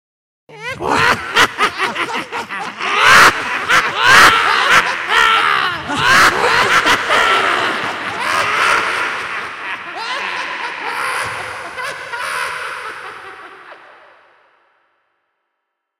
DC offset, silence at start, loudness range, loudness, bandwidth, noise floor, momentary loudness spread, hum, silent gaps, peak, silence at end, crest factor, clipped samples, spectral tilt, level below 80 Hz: under 0.1%; 0.5 s; 15 LU; -13 LUFS; 17 kHz; -75 dBFS; 16 LU; none; none; 0 dBFS; 2.25 s; 16 dB; under 0.1%; -1.5 dB/octave; -48 dBFS